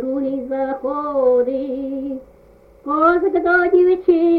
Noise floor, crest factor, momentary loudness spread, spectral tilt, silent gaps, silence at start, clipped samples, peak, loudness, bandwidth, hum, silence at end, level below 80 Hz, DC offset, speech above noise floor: -48 dBFS; 14 dB; 12 LU; -8 dB/octave; none; 0 s; under 0.1%; -4 dBFS; -18 LUFS; 4.7 kHz; none; 0 s; -50 dBFS; under 0.1%; 32 dB